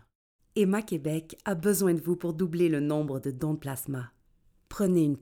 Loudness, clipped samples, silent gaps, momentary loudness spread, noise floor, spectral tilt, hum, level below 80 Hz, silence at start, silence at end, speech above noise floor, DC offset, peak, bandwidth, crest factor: -29 LUFS; under 0.1%; none; 10 LU; -65 dBFS; -6.5 dB/octave; none; -60 dBFS; 0.55 s; 0 s; 37 dB; under 0.1%; -14 dBFS; 18.5 kHz; 14 dB